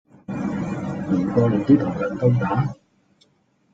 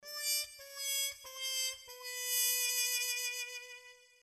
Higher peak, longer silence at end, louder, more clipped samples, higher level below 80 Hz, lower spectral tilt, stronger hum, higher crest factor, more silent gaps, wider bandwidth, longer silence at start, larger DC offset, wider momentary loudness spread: first, -4 dBFS vs -20 dBFS; first, 1 s vs 0.25 s; first, -21 LUFS vs -34 LUFS; neither; first, -52 dBFS vs -82 dBFS; first, -9.5 dB/octave vs 5 dB/octave; neither; about the same, 18 dB vs 20 dB; neither; second, 7.8 kHz vs 15.5 kHz; first, 0.3 s vs 0 s; neither; second, 10 LU vs 14 LU